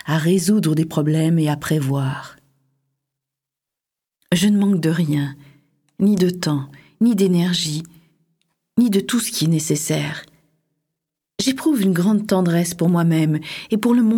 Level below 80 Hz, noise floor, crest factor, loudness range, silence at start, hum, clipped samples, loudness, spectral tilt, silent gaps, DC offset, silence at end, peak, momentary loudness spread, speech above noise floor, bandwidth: -60 dBFS; -86 dBFS; 16 dB; 3 LU; 0.05 s; none; under 0.1%; -19 LUFS; -5.5 dB/octave; none; under 0.1%; 0 s; -2 dBFS; 8 LU; 68 dB; 17.5 kHz